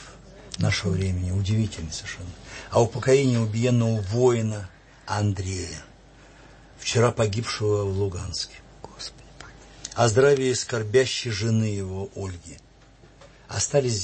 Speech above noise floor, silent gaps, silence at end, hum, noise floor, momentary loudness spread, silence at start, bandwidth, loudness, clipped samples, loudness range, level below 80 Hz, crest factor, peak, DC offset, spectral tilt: 28 dB; none; 0 s; none; -52 dBFS; 19 LU; 0 s; 8.8 kHz; -24 LUFS; under 0.1%; 4 LU; -50 dBFS; 18 dB; -6 dBFS; under 0.1%; -5 dB/octave